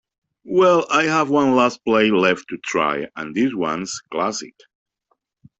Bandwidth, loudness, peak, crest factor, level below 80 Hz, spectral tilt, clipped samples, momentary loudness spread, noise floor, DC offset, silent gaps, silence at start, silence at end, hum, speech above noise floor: 8.4 kHz; -19 LUFS; -4 dBFS; 16 dB; -62 dBFS; -4.5 dB/octave; under 0.1%; 11 LU; -70 dBFS; under 0.1%; none; 0.45 s; 1.1 s; none; 51 dB